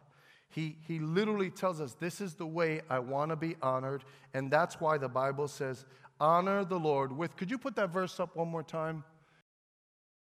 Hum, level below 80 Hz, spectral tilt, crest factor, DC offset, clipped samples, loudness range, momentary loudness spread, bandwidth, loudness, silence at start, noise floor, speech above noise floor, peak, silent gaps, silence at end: none; -78 dBFS; -6.5 dB/octave; 20 dB; under 0.1%; under 0.1%; 3 LU; 10 LU; 15.5 kHz; -34 LUFS; 0.55 s; -63 dBFS; 30 dB; -14 dBFS; none; 1.25 s